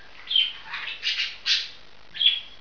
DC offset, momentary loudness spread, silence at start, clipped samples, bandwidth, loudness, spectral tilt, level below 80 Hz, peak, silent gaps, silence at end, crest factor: 0.6%; 12 LU; 0.15 s; under 0.1%; 5.4 kHz; -23 LUFS; 2 dB/octave; -64 dBFS; -6 dBFS; none; 0.05 s; 20 dB